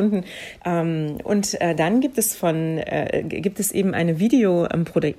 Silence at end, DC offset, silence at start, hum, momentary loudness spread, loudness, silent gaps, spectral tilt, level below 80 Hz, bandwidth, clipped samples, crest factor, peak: 0.05 s; under 0.1%; 0 s; none; 7 LU; -21 LUFS; none; -5.5 dB/octave; -54 dBFS; 15.5 kHz; under 0.1%; 14 dB; -6 dBFS